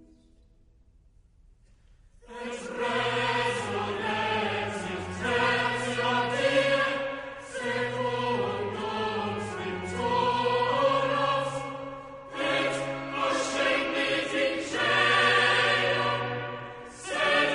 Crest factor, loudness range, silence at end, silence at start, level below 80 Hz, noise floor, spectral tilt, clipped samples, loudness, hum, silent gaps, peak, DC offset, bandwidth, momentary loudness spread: 16 dB; 7 LU; 0 s; 2.25 s; -58 dBFS; -59 dBFS; -4 dB/octave; under 0.1%; -27 LUFS; none; none; -12 dBFS; under 0.1%; 10.5 kHz; 13 LU